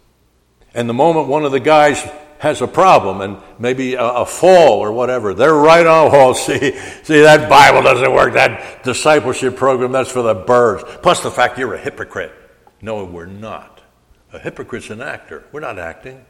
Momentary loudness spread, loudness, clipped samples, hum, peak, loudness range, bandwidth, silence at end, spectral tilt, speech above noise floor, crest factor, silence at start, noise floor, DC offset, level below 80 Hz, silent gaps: 21 LU; -12 LUFS; under 0.1%; none; 0 dBFS; 19 LU; 16 kHz; 0.15 s; -4.5 dB/octave; 44 dB; 14 dB; 0.75 s; -56 dBFS; under 0.1%; -46 dBFS; none